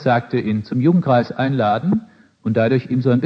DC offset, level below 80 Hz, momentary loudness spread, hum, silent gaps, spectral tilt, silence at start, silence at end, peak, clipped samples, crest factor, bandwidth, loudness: under 0.1%; -58 dBFS; 6 LU; none; none; -9.5 dB/octave; 0 s; 0 s; -4 dBFS; under 0.1%; 14 dB; 6 kHz; -18 LUFS